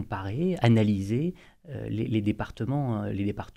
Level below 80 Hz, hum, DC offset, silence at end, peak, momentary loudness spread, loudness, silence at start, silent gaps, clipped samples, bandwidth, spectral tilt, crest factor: -52 dBFS; none; under 0.1%; 0.05 s; -8 dBFS; 11 LU; -28 LUFS; 0 s; none; under 0.1%; 9.8 kHz; -8 dB/octave; 20 dB